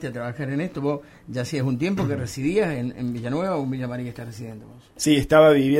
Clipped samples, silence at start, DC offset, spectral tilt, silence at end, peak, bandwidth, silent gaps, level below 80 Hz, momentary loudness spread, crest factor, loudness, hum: under 0.1%; 0 s; under 0.1%; -6 dB/octave; 0 s; -4 dBFS; 16 kHz; none; -48 dBFS; 18 LU; 20 dB; -23 LUFS; none